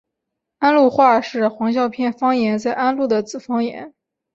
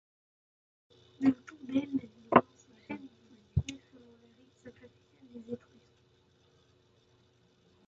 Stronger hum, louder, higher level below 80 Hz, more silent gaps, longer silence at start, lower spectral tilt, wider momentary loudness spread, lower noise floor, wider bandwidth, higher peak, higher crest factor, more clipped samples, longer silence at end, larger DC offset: neither; first, -18 LUFS vs -33 LUFS; second, -62 dBFS vs -54 dBFS; neither; second, 0.6 s vs 1.2 s; about the same, -5.5 dB/octave vs -6 dB/octave; second, 9 LU vs 28 LU; first, -80 dBFS vs -67 dBFS; about the same, 7.8 kHz vs 7.6 kHz; first, -2 dBFS vs -6 dBFS; second, 16 dB vs 30 dB; neither; second, 0.45 s vs 2.3 s; neither